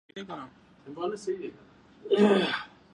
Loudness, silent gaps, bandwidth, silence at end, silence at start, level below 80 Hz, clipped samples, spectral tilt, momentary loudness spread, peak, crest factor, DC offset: -27 LUFS; none; 10.5 kHz; 0.25 s; 0.15 s; -72 dBFS; under 0.1%; -6 dB/octave; 23 LU; -10 dBFS; 20 dB; under 0.1%